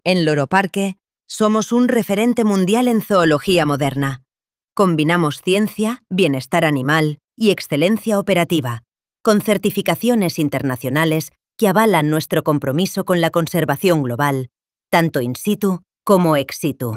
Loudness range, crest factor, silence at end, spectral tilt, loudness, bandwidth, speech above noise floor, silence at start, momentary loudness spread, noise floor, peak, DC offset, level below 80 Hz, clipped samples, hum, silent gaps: 2 LU; 18 dB; 0 s; -5.5 dB/octave; -17 LUFS; 16.5 kHz; over 73 dB; 0.05 s; 8 LU; under -90 dBFS; 0 dBFS; under 0.1%; -56 dBFS; under 0.1%; none; none